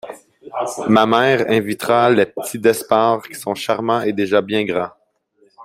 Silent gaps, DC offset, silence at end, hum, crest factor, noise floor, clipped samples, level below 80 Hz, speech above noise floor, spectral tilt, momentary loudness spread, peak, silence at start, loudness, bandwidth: none; under 0.1%; 0 s; none; 16 dB; -59 dBFS; under 0.1%; -60 dBFS; 42 dB; -5 dB/octave; 11 LU; 0 dBFS; 0.05 s; -17 LUFS; 16 kHz